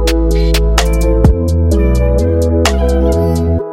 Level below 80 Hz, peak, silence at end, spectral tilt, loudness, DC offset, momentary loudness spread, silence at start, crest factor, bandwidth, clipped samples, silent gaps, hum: -14 dBFS; 0 dBFS; 0 s; -6 dB/octave; -12 LUFS; under 0.1%; 2 LU; 0 s; 10 dB; 16 kHz; under 0.1%; none; none